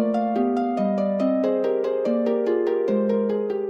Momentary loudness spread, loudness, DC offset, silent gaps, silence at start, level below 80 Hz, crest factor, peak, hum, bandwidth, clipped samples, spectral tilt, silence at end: 1 LU; -23 LUFS; under 0.1%; none; 0 s; -68 dBFS; 12 dB; -10 dBFS; none; 7.6 kHz; under 0.1%; -9 dB/octave; 0 s